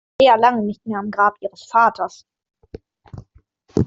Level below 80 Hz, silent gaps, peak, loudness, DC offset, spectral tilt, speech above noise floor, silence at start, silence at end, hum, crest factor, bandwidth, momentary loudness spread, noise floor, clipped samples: -52 dBFS; none; -2 dBFS; -18 LUFS; under 0.1%; -6 dB/octave; 38 dB; 0.2 s; 0 s; none; 18 dB; 7.6 kHz; 15 LU; -55 dBFS; under 0.1%